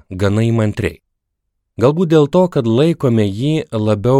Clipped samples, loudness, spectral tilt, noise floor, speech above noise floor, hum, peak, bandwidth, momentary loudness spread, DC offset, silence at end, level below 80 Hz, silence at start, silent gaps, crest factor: under 0.1%; -15 LUFS; -8 dB/octave; -73 dBFS; 59 dB; none; 0 dBFS; 12.5 kHz; 6 LU; under 0.1%; 0 s; -46 dBFS; 0.1 s; none; 14 dB